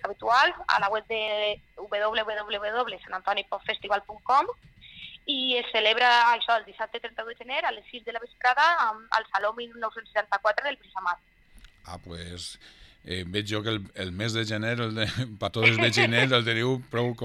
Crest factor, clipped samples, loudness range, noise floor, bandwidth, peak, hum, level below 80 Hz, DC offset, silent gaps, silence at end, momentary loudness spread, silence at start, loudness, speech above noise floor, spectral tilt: 22 dB; under 0.1%; 8 LU; -53 dBFS; 12.5 kHz; -6 dBFS; none; -58 dBFS; under 0.1%; none; 0 s; 16 LU; 0.05 s; -26 LUFS; 27 dB; -4.5 dB/octave